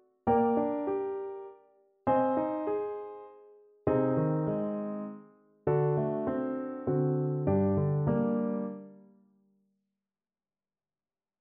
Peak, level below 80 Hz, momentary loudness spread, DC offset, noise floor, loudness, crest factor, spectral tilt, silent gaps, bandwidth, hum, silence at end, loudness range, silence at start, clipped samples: -14 dBFS; -62 dBFS; 14 LU; under 0.1%; under -90 dBFS; -30 LUFS; 18 dB; -10 dB/octave; none; 3.4 kHz; none; 2.45 s; 4 LU; 0.25 s; under 0.1%